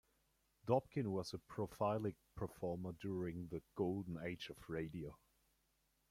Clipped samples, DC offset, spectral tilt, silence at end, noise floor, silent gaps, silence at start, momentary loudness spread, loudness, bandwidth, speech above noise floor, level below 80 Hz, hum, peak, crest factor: under 0.1%; under 0.1%; -7 dB/octave; 0.95 s; -81 dBFS; none; 0.65 s; 10 LU; -44 LUFS; 16.5 kHz; 38 dB; -68 dBFS; none; -22 dBFS; 22 dB